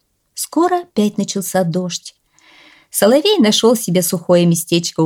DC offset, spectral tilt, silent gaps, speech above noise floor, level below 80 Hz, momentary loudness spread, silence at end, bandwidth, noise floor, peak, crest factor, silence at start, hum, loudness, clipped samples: under 0.1%; -4.5 dB/octave; none; 34 dB; -62 dBFS; 11 LU; 0 s; 18.5 kHz; -48 dBFS; -2 dBFS; 14 dB; 0.35 s; none; -15 LUFS; under 0.1%